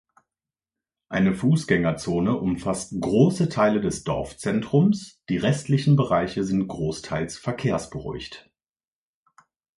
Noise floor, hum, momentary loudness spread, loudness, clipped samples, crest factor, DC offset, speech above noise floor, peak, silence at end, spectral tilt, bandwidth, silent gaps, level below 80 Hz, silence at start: under -90 dBFS; none; 10 LU; -24 LUFS; under 0.1%; 20 dB; under 0.1%; over 67 dB; -4 dBFS; 1.35 s; -6.5 dB/octave; 11.5 kHz; none; -50 dBFS; 1.1 s